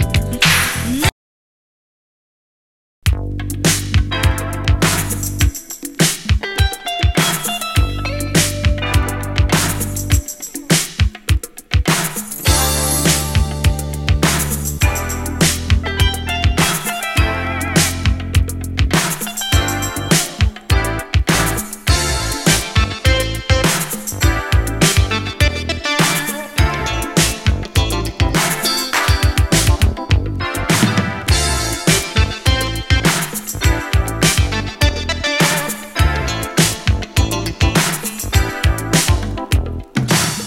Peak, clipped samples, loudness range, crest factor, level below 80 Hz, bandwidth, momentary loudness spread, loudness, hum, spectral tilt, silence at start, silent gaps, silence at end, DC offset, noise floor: 0 dBFS; under 0.1%; 2 LU; 16 dB; -22 dBFS; 17 kHz; 6 LU; -16 LUFS; none; -3.5 dB/octave; 0 s; 1.12-3.02 s; 0 s; under 0.1%; under -90 dBFS